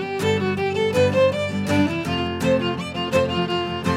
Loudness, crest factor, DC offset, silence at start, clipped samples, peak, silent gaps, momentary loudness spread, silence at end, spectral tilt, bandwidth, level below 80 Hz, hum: -21 LUFS; 14 dB; under 0.1%; 0 s; under 0.1%; -6 dBFS; none; 5 LU; 0 s; -6 dB/octave; 15.5 kHz; -48 dBFS; none